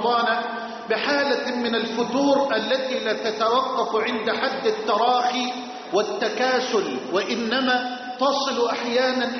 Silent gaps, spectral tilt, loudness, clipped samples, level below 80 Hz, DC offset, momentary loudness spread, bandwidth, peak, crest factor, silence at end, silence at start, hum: none; -1 dB/octave; -23 LUFS; under 0.1%; -70 dBFS; under 0.1%; 5 LU; 6.4 kHz; -10 dBFS; 14 dB; 0 s; 0 s; none